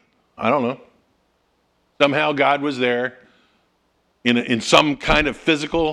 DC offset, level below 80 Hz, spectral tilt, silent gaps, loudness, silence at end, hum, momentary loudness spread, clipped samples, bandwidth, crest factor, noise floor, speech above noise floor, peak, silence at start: under 0.1%; -40 dBFS; -4 dB/octave; none; -19 LUFS; 0 s; none; 9 LU; under 0.1%; 14 kHz; 20 dB; -65 dBFS; 47 dB; 0 dBFS; 0.4 s